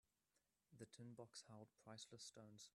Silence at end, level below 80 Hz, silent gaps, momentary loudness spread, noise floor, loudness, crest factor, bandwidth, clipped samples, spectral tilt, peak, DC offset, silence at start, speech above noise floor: 0.05 s; under -90 dBFS; none; 6 LU; -89 dBFS; -61 LUFS; 20 dB; 13 kHz; under 0.1%; -3.5 dB/octave; -42 dBFS; under 0.1%; 0.7 s; 28 dB